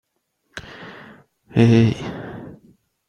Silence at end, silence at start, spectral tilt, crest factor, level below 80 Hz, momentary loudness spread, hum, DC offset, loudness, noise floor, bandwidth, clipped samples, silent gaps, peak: 0.6 s; 0.55 s; -8 dB/octave; 20 dB; -50 dBFS; 24 LU; none; under 0.1%; -18 LUFS; -71 dBFS; 7 kHz; under 0.1%; none; -2 dBFS